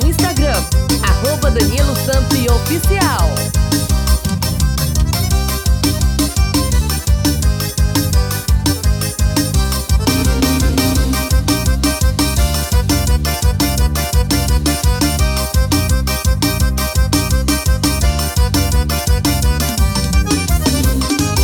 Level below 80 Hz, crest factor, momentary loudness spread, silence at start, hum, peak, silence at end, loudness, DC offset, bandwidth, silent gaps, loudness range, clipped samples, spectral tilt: -18 dBFS; 14 dB; 2 LU; 0 s; none; 0 dBFS; 0 s; -15 LUFS; under 0.1%; over 20 kHz; none; 1 LU; under 0.1%; -4.5 dB/octave